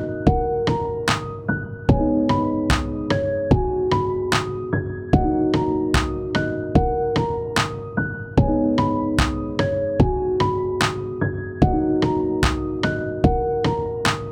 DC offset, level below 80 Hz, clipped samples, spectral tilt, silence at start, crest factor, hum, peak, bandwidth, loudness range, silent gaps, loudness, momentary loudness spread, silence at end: under 0.1%; -32 dBFS; under 0.1%; -6 dB/octave; 0 s; 18 dB; none; -2 dBFS; 17.5 kHz; 1 LU; none; -21 LUFS; 5 LU; 0 s